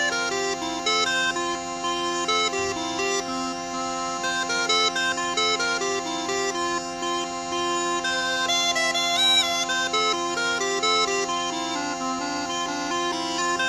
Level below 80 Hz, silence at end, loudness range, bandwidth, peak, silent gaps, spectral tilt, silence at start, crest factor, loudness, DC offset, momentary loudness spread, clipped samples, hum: -58 dBFS; 0 s; 4 LU; 15 kHz; -10 dBFS; none; -1 dB/octave; 0 s; 16 dB; -23 LUFS; under 0.1%; 7 LU; under 0.1%; none